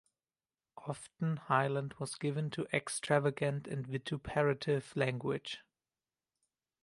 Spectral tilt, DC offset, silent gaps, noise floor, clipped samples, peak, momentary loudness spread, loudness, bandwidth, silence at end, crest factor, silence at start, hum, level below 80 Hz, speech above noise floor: -5.5 dB/octave; under 0.1%; none; under -90 dBFS; under 0.1%; -14 dBFS; 12 LU; -36 LUFS; 11.5 kHz; 1.2 s; 22 dB; 0.75 s; none; -68 dBFS; over 55 dB